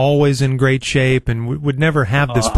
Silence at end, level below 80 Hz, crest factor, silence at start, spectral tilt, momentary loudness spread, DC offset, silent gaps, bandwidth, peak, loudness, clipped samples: 0 s; -36 dBFS; 14 dB; 0 s; -6 dB/octave; 5 LU; 0.5%; none; 12.5 kHz; -2 dBFS; -16 LUFS; under 0.1%